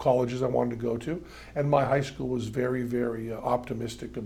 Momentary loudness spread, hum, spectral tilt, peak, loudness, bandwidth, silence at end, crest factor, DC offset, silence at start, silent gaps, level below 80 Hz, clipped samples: 10 LU; none; -7 dB/octave; -8 dBFS; -29 LUFS; 15.5 kHz; 0 s; 20 dB; under 0.1%; 0 s; none; -52 dBFS; under 0.1%